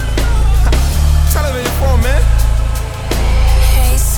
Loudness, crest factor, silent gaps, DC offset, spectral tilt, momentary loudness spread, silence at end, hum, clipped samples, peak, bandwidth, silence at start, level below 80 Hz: -14 LUFS; 10 dB; none; under 0.1%; -5 dB/octave; 5 LU; 0 s; none; under 0.1%; 0 dBFS; 19 kHz; 0 s; -12 dBFS